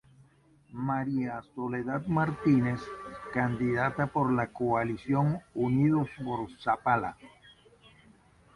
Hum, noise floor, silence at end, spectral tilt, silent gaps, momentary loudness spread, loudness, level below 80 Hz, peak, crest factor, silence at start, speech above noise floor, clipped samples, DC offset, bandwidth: none; -62 dBFS; 1.3 s; -9 dB/octave; none; 11 LU; -30 LUFS; -60 dBFS; -12 dBFS; 18 dB; 0.7 s; 33 dB; under 0.1%; under 0.1%; 11 kHz